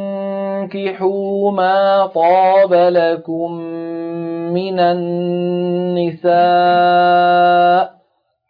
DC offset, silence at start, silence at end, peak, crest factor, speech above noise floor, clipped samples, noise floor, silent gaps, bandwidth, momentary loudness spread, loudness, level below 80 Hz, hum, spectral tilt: under 0.1%; 0 s; 0.6 s; -2 dBFS; 12 dB; 49 dB; under 0.1%; -62 dBFS; none; 5.2 kHz; 12 LU; -15 LUFS; -68 dBFS; none; -9 dB/octave